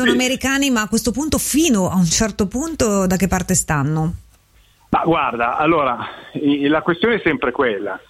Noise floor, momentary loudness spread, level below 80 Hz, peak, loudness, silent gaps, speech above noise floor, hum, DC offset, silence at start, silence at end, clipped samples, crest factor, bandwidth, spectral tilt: -53 dBFS; 6 LU; -38 dBFS; -4 dBFS; -18 LUFS; none; 35 dB; none; under 0.1%; 0 s; 0.1 s; under 0.1%; 14 dB; 16 kHz; -4 dB/octave